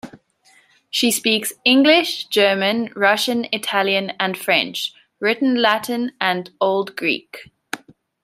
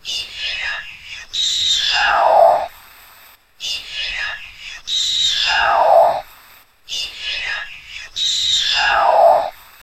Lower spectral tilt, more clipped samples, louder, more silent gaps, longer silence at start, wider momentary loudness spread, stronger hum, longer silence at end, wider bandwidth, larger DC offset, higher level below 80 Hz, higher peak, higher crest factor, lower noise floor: first, -3 dB/octave vs 1 dB/octave; neither; about the same, -18 LUFS vs -16 LUFS; neither; about the same, 0.05 s vs 0.05 s; second, 11 LU vs 16 LU; neither; about the same, 0.45 s vs 0.45 s; first, 16 kHz vs 14 kHz; neither; second, -70 dBFS vs -48 dBFS; about the same, -2 dBFS vs 0 dBFS; about the same, 18 dB vs 18 dB; first, -56 dBFS vs -47 dBFS